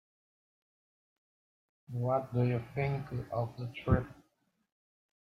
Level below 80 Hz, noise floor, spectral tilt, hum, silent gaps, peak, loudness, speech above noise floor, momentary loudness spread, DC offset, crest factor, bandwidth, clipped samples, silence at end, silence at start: -52 dBFS; -76 dBFS; -9.5 dB/octave; none; none; -16 dBFS; -34 LUFS; 43 dB; 8 LU; under 0.1%; 22 dB; 5.8 kHz; under 0.1%; 1.2 s; 1.9 s